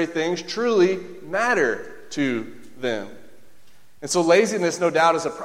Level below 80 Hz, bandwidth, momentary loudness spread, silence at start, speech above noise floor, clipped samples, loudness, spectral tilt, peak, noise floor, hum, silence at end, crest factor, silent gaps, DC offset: -66 dBFS; 15 kHz; 14 LU; 0 s; 34 dB; under 0.1%; -22 LUFS; -4 dB/octave; -4 dBFS; -55 dBFS; none; 0 s; 18 dB; none; 0.9%